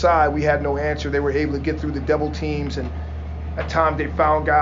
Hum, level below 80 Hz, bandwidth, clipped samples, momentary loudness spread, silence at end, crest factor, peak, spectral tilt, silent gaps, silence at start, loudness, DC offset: none; -30 dBFS; 7.6 kHz; under 0.1%; 12 LU; 0 s; 16 dB; -4 dBFS; -7 dB/octave; none; 0 s; -22 LUFS; under 0.1%